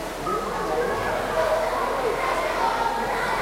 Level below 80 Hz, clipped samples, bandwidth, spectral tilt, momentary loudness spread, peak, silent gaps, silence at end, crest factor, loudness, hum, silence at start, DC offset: -44 dBFS; under 0.1%; 16.5 kHz; -4 dB/octave; 3 LU; -12 dBFS; none; 0 s; 14 dB; -24 LUFS; none; 0 s; under 0.1%